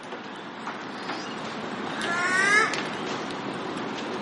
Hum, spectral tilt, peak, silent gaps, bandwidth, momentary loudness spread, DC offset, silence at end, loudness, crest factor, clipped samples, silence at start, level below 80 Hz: none; -3 dB/octave; -10 dBFS; none; 11.5 kHz; 16 LU; under 0.1%; 0 s; -27 LUFS; 20 dB; under 0.1%; 0 s; -70 dBFS